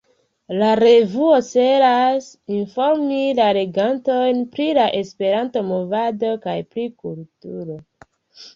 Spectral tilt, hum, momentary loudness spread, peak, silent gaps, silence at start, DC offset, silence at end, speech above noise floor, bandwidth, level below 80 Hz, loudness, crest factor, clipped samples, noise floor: -6 dB/octave; none; 17 LU; -4 dBFS; none; 0.5 s; under 0.1%; 0.05 s; 31 dB; 7.6 kHz; -64 dBFS; -18 LUFS; 16 dB; under 0.1%; -48 dBFS